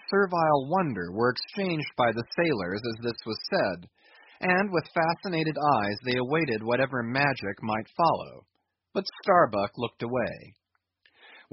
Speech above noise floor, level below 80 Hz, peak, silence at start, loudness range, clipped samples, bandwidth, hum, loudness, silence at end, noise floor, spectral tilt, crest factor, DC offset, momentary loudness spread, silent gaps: 41 dB; -64 dBFS; -6 dBFS; 0.1 s; 2 LU; under 0.1%; 6 kHz; none; -27 LUFS; 0.15 s; -68 dBFS; -4 dB/octave; 22 dB; under 0.1%; 9 LU; none